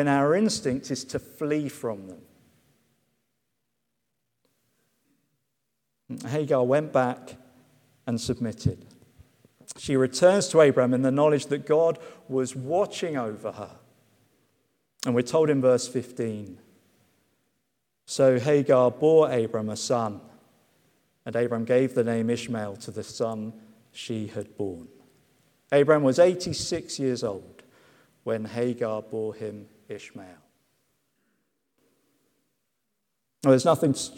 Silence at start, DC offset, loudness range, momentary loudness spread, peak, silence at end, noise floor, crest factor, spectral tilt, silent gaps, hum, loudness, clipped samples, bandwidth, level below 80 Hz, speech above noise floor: 0 s; under 0.1%; 11 LU; 20 LU; -6 dBFS; 0.05 s; -80 dBFS; 20 dB; -5.5 dB/octave; none; none; -25 LUFS; under 0.1%; 16 kHz; -64 dBFS; 56 dB